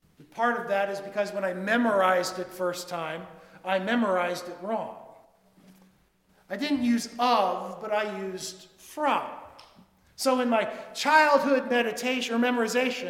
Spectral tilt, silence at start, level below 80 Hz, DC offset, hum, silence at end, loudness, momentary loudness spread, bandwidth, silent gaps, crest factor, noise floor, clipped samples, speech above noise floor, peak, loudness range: -3.5 dB/octave; 0.2 s; -72 dBFS; under 0.1%; none; 0 s; -26 LUFS; 16 LU; 16 kHz; none; 22 dB; -64 dBFS; under 0.1%; 38 dB; -6 dBFS; 6 LU